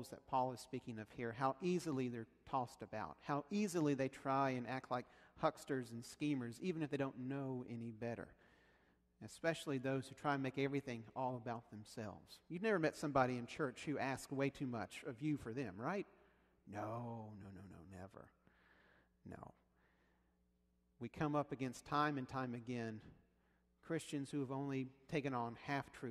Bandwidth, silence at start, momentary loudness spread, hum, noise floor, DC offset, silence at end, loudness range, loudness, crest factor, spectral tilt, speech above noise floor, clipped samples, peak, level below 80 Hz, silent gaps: 13 kHz; 0 s; 16 LU; none; -79 dBFS; under 0.1%; 0 s; 11 LU; -43 LUFS; 24 dB; -6 dB/octave; 36 dB; under 0.1%; -20 dBFS; -74 dBFS; none